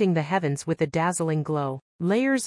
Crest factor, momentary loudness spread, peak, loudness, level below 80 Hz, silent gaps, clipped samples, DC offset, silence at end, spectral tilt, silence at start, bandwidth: 14 dB; 6 LU; -10 dBFS; -25 LUFS; -64 dBFS; 1.82-1.99 s; under 0.1%; under 0.1%; 0 s; -6 dB/octave; 0 s; 12 kHz